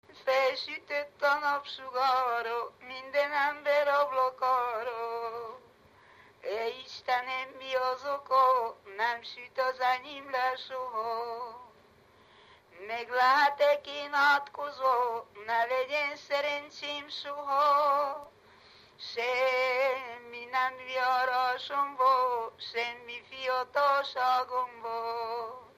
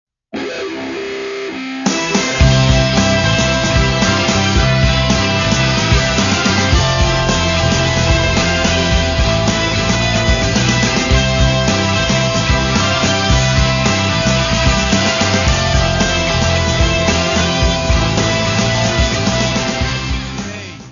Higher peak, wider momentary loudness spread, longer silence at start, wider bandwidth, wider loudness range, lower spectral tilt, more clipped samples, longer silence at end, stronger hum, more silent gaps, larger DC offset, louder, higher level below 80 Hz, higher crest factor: second, -14 dBFS vs 0 dBFS; first, 13 LU vs 8 LU; second, 0.15 s vs 0.35 s; first, 15 kHz vs 7.4 kHz; first, 6 LU vs 1 LU; second, -2 dB/octave vs -4 dB/octave; neither; about the same, 0.1 s vs 0 s; neither; neither; neither; second, -30 LUFS vs -14 LUFS; second, -78 dBFS vs -22 dBFS; about the same, 18 dB vs 14 dB